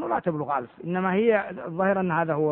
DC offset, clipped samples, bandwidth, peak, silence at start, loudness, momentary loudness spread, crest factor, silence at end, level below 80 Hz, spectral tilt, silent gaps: under 0.1%; under 0.1%; 4 kHz; -10 dBFS; 0 s; -25 LUFS; 8 LU; 16 dB; 0 s; -64 dBFS; -11.5 dB/octave; none